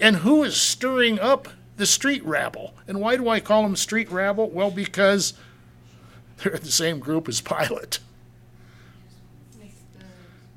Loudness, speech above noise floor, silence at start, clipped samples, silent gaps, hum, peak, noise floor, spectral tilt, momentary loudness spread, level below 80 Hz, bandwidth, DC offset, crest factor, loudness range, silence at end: -22 LUFS; 28 dB; 0 s; under 0.1%; none; none; -4 dBFS; -50 dBFS; -3 dB/octave; 10 LU; -58 dBFS; 16.5 kHz; under 0.1%; 20 dB; 7 LU; 0.45 s